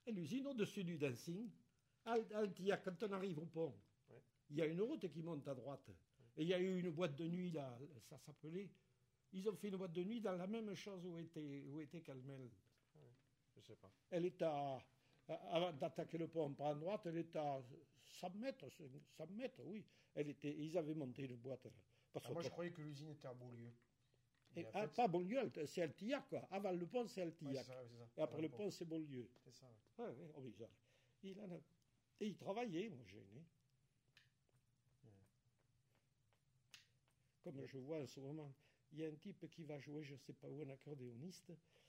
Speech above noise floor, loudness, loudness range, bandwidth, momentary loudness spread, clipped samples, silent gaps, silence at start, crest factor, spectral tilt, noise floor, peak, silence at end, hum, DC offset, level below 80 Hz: 35 dB; -49 LUFS; 9 LU; 16 kHz; 17 LU; under 0.1%; none; 0.05 s; 22 dB; -6.5 dB/octave; -83 dBFS; -26 dBFS; 0.3 s; none; under 0.1%; under -90 dBFS